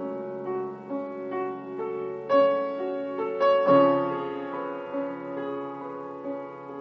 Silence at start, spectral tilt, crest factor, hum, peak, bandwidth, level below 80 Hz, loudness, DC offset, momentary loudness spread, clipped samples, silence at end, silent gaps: 0 s; -8 dB/octave; 18 dB; none; -10 dBFS; 6.2 kHz; -76 dBFS; -27 LUFS; under 0.1%; 15 LU; under 0.1%; 0 s; none